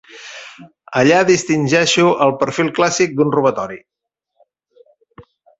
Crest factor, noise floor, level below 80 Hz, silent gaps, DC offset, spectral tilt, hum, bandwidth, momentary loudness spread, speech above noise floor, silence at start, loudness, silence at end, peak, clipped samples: 16 dB; -64 dBFS; -58 dBFS; none; under 0.1%; -4.5 dB/octave; none; 8.2 kHz; 21 LU; 49 dB; 0.15 s; -15 LUFS; 0.4 s; -2 dBFS; under 0.1%